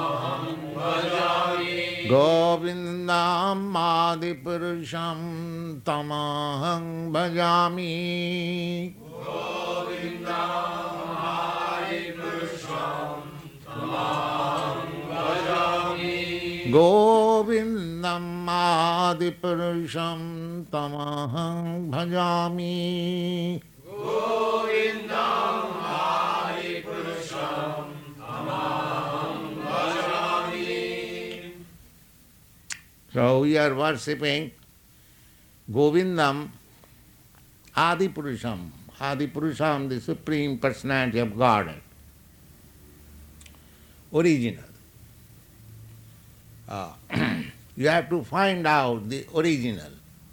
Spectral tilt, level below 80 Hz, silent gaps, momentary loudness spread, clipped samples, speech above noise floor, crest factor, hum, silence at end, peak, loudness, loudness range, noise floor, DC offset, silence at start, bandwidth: -5.5 dB/octave; -58 dBFS; none; 12 LU; under 0.1%; 30 dB; 20 dB; none; 0.05 s; -6 dBFS; -26 LUFS; 8 LU; -55 dBFS; under 0.1%; 0 s; 19.5 kHz